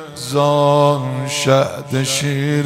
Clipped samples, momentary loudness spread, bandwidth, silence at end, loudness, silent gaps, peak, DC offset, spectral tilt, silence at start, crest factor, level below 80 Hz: under 0.1%; 7 LU; 16 kHz; 0 s; -16 LUFS; none; -2 dBFS; under 0.1%; -5 dB/octave; 0 s; 14 dB; -58 dBFS